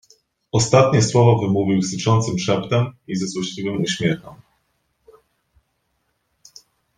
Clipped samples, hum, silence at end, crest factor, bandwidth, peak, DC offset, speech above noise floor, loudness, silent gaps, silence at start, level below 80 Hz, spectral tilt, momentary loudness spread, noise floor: under 0.1%; none; 2.65 s; 18 dB; 9.8 kHz; -2 dBFS; under 0.1%; 52 dB; -19 LUFS; none; 0.55 s; -54 dBFS; -5.5 dB/octave; 10 LU; -70 dBFS